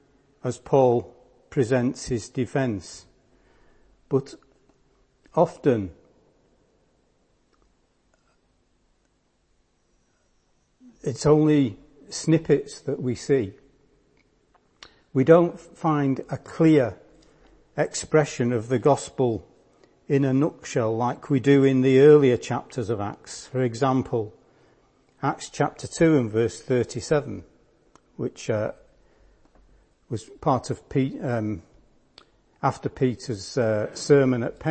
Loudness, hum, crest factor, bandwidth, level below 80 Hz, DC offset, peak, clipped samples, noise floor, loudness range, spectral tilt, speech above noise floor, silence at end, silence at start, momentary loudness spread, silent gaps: -23 LUFS; none; 22 dB; 8.8 kHz; -56 dBFS; under 0.1%; -2 dBFS; under 0.1%; -68 dBFS; 9 LU; -6.5 dB/octave; 45 dB; 0 s; 0.45 s; 15 LU; none